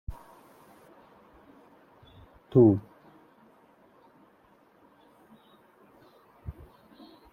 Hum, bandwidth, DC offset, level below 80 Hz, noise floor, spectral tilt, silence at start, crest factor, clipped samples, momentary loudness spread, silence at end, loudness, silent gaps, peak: none; 4.6 kHz; under 0.1%; -54 dBFS; -61 dBFS; -11 dB/octave; 0.1 s; 24 dB; under 0.1%; 31 LU; 0.8 s; -23 LUFS; none; -8 dBFS